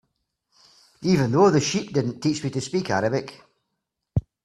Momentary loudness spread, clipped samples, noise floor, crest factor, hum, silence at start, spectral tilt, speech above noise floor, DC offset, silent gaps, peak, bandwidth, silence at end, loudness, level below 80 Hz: 12 LU; under 0.1%; -80 dBFS; 20 dB; none; 1 s; -5.5 dB/octave; 58 dB; under 0.1%; none; -6 dBFS; 12.5 kHz; 0.25 s; -23 LUFS; -50 dBFS